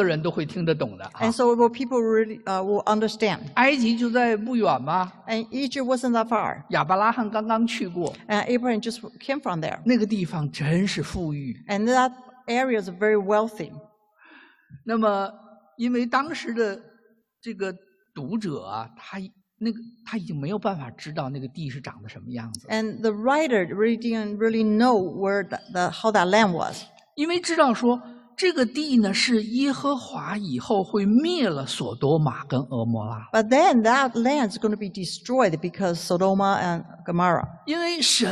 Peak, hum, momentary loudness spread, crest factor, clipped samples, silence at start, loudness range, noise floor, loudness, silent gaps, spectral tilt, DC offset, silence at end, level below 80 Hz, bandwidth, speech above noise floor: -6 dBFS; none; 13 LU; 18 dB; under 0.1%; 0 s; 9 LU; -62 dBFS; -24 LUFS; none; -5 dB/octave; under 0.1%; 0 s; -60 dBFS; 12.5 kHz; 38 dB